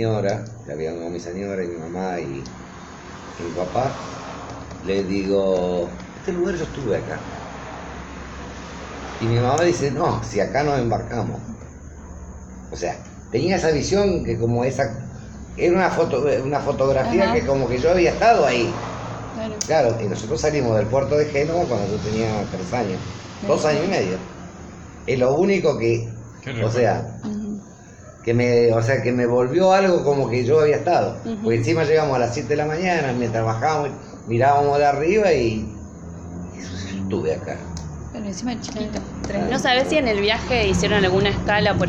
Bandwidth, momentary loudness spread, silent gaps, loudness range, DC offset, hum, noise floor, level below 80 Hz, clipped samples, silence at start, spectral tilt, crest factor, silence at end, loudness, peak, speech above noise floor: 8.8 kHz; 17 LU; none; 9 LU; under 0.1%; none; -42 dBFS; -40 dBFS; under 0.1%; 0 s; -5.5 dB/octave; 18 dB; 0 s; -21 LUFS; -4 dBFS; 22 dB